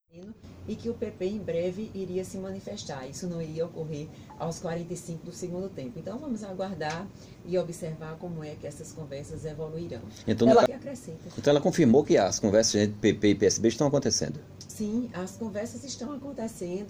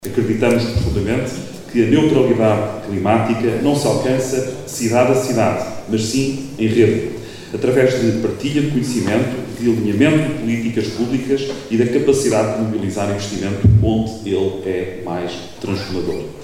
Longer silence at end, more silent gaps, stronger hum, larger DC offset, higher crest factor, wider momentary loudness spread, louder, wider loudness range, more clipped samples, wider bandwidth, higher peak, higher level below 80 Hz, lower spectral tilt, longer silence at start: about the same, 0 s vs 0 s; neither; neither; neither; about the same, 20 dB vs 16 dB; first, 17 LU vs 9 LU; second, -29 LUFS vs -18 LUFS; first, 12 LU vs 2 LU; neither; about the same, 16 kHz vs 16 kHz; second, -8 dBFS vs 0 dBFS; second, -58 dBFS vs -36 dBFS; about the same, -5 dB/octave vs -6 dB/octave; first, 0.15 s vs 0 s